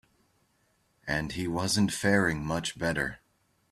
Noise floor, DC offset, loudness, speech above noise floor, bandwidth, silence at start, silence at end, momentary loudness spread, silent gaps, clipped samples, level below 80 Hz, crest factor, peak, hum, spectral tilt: -71 dBFS; under 0.1%; -29 LUFS; 42 dB; 14.5 kHz; 1.05 s; 0.55 s; 8 LU; none; under 0.1%; -54 dBFS; 20 dB; -10 dBFS; none; -4.5 dB/octave